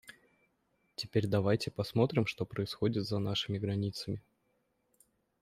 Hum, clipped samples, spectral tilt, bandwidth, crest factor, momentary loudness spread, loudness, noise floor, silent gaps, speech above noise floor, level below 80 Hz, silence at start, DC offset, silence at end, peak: none; under 0.1%; -6.5 dB/octave; 14.5 kHz; 20 dB; 10 LU; -34 LUFS; -77 dBFS; none; 44 dB; -66 dBFS; 0.05 s; under 0.1%; 1.2 s; -14 dBFS